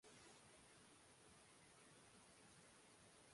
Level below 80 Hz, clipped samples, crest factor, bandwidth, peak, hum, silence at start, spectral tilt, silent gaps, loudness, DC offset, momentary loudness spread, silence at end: -86 dBFS; under 0.1%; 16 dB; 11.5 kHz; -54 dBFS; none; 0 s; -2.5 dB/octave; none; -67 LUFS; under 0.1%; 2 LU; 0 s